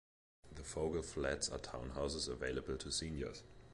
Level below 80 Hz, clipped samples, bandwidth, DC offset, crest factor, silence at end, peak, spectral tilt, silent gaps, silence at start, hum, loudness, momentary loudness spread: -54 dBFS; under 0.1%; 11.5 kHz; under 0.1%; 18 dB; 0 s; -24 dBFS; -3.5 dB/octave; none; 0.45 s; none; -42 LUFS; 8 LU